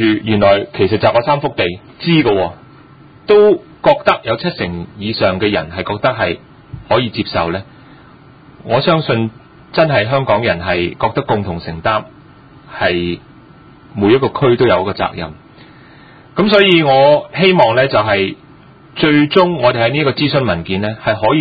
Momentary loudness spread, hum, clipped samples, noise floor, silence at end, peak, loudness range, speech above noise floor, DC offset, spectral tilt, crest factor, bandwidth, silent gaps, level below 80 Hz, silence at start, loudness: 12 LU; none; under 0.1%; -41 dBFS; 0 s; 0 dBFS; 6 LU; 28 dB; under 0.1%; -8.5 dB/octave; 14 dB; 5 kHz; none; -42 dBFS; 0 s; -14 LUFS